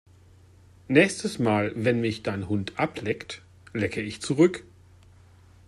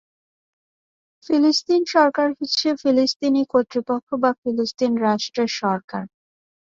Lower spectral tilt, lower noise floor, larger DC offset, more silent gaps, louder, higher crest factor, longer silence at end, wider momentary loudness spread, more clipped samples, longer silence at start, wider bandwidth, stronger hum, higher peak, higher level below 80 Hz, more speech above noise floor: first, -5.5 dB/octave vs -4 dB/octave; second, -54 dBFS vs under -90 dBFS; neither; second, none vs 3.16-3.20 s, 4.03-4.07 s, 4.38-4.43 s, 5.84-5.88 s; second, -26 LUFS vs -20 LUFS; about the same, 22 dB vs 18 dB; first, 1.05 s vs 0.7 s; first, 13 LU vs 7 LU; neither; second, 0.9 s vs 1.3 s; first, 12.5 kHz vs 7.6 kHz; neither; about the same, -4 dBFS vs -4 dBFS; first, -60 dBFS vs -66 dBFS; second, 29 dB vs over 70 dB